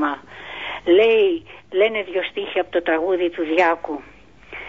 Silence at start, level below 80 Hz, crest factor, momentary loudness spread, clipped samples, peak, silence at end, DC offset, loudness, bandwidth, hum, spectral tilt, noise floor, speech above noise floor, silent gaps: 0 s; -56 dBFS; 16 dB; 15 LU; under 0.1%; -4 dBFS; 0 s; 0.3%; -20 LUFS; 7.4 kHz; none; -5.5 dB/octave; -39 dBFS; 20 dB; none